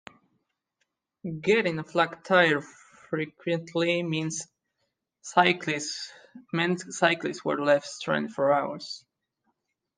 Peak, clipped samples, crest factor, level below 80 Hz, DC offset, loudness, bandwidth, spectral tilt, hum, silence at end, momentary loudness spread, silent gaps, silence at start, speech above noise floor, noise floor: -6 dBFS; under 0.1%; 22 dB; -74 dBFS; under 0.1%; -26 LUFS; 10 kHz; -4.5 dB/octave; none; 1 s; 15 LU; none; 1.25 s; 53 dB; -79 dBFS